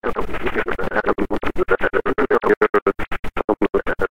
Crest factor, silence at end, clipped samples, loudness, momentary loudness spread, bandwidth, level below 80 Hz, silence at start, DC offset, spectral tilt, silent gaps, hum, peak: 16 dB; 0.05 s; under 0.1%; -20 LUFS; 8 LU; 15.5 kHz; -34 dBFS; 0 s; 4%; -7 dB/octave; 2.57-2.61 s, 2.82-2.86 s, 3.19-3.23 s, 3.44-3.48 s; none; -2 dBFS